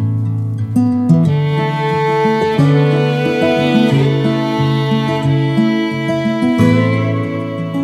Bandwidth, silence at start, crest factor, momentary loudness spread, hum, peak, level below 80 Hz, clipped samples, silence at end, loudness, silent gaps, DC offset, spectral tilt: 11 kHz; 0 s; 14 dB; 6 LU; none; 0 dBFS; -52 dBFS; under 0.1%; 0 s; -14 LUFS; none; under 0.1%; -8 dB/octave